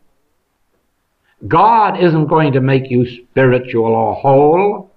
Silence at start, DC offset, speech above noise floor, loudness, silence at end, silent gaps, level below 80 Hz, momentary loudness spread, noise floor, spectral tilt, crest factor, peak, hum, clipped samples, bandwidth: 1.45 s; under 0.1%; 51 dB; -13 LUFS; 0.15 s; none; -48 dBFS; 6 LU; -64 dBFS; -10.5 dB/octave; 12 dB; -2 dBFS; none; under 0.1%; 5 kHz